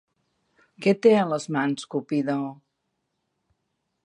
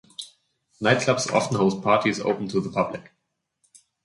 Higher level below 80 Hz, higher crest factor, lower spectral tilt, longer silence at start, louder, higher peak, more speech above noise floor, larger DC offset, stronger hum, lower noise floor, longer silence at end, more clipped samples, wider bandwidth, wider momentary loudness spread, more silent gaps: second, -76 dBFS vs -60 dBFS; about the same, 22 dB vs 20 dB; about the same, -6 dB/octave vs -5 dB/octave; first, 0.8 s vs 0.2 s; about the same, -24 LUFS vs -23 LUFS; about the same, -6 dBFS vs -4 dBFS; about the same, 55 dB vs 54 dB; neither; neither; about the same, -78 dBFS vs -76 dBFS; first, 1.5 s vs 1.05 s; neither; about the same, 11 kHz vs 11.5 kHz; second, 11 LU vs 18 LU; neither